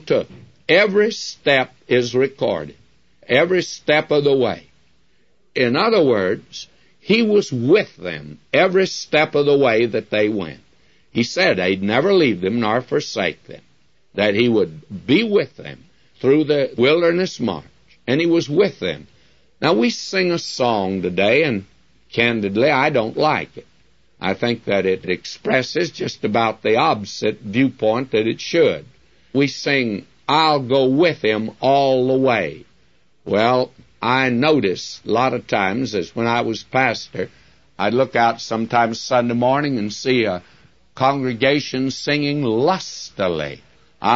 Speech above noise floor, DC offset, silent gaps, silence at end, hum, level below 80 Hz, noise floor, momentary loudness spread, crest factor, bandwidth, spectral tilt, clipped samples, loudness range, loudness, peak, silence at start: 45 dB; 0.2%; none; 0 s; none; -58 dBFS; -63 dBFS; 11 LU; 16 dB; 7.8 kHz; -5.5 dB/octave; under 0.1%; 2 LU; -18 LUFS; -2 dBFS; 0.05 s